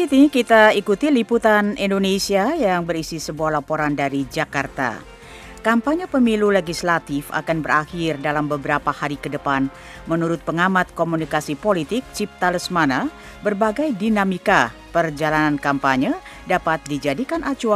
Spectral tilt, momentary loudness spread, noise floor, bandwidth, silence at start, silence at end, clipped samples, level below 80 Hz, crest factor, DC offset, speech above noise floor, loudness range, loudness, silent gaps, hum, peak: -5 dB/octave; 9 LU; -39 dBFS; 15 kHz; 0 s; 0 s; under 0.1%; -46 dBFS; 20 dB; under 0.1%; 20 dB; 3 LU; -20 LUFS; none; none; 0 dBFS